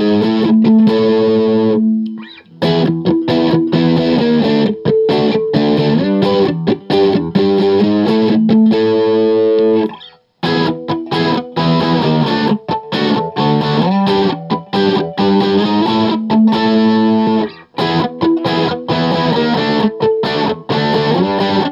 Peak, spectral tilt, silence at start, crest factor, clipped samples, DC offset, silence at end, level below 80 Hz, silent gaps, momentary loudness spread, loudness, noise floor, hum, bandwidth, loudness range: 0 dBFS; -8 dB/octave; 0 s; 12 dB; under 0.1%; under 0.1%; 0 s; -54 dBFS; none; 5 LU; -13 LUFS; -37 dBFS; none; 7.2 kHz; 2 LU